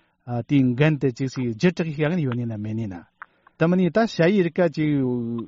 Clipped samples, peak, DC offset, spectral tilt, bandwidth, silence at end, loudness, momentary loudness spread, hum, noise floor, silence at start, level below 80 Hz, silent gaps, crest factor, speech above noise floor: under 0.1%; -6 dBFS; under 0.1%; -7 dB/octave; 7.6 kHz; 0 s; -22 LUFS; 10 LU; none; -44 dBFS; 0.25 s; -58 dBFS; none; 16 dB; 23 dB